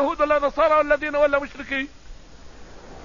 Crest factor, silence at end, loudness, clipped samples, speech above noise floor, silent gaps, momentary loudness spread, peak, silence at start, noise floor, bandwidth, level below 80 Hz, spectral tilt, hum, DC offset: 16 dB; 0 s; -21 LUFS; under 0.1%; 22 dB; none; 9 LU; -6 dBFS; 0 s; -43 dBFS; 7.4 kHz; -44 dBFS; -5 dB/octave; none; 0.4%